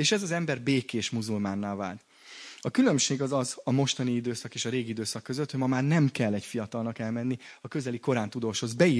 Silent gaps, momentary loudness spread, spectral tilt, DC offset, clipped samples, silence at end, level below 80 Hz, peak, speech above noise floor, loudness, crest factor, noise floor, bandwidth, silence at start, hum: none; 10 LU; -5 dB/octave; under 0.1%; under 0.1%; 0 s; -70 dBFS; -8 dBFS; 19 dB; -29 LUFS; 20 dB; -48 dBFS; 11 kHz; 0 s; none